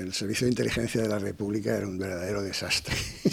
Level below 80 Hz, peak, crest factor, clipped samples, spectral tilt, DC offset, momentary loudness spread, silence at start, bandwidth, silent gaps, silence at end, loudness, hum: -50 dBFS; -10 dBFS; 18 dB; under 0.1%; -4.5 dB/octave; under 0.1%; 5 LU; 0 s; 18.5 kHz; none; 0 s; -29 LUFS; none